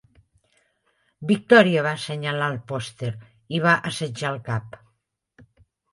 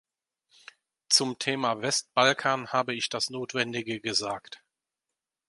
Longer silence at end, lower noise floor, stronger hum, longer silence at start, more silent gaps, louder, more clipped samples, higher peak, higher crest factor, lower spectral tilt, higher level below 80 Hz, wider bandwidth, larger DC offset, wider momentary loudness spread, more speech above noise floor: first, 1.25 s vs 0.95 s; second, -73 dBFS vs -88 dBFS; neither; about the same, 1.2 s vs 1.1 s; neither; first, -22 LUFS vs -27 LUFS; neither; first, -2 dBFS vs -6 dBFS; about the same, 22 dB vs 24 dB; first, -5.5 dB/octave vs -2 dB/octave; first, -62 dBFS vs -74 dBFS; about the same, 11.5 kHz vs 11.5 kHz; neither; first, 16 LU vs 8 LU; second, 51 dB vs 59 dB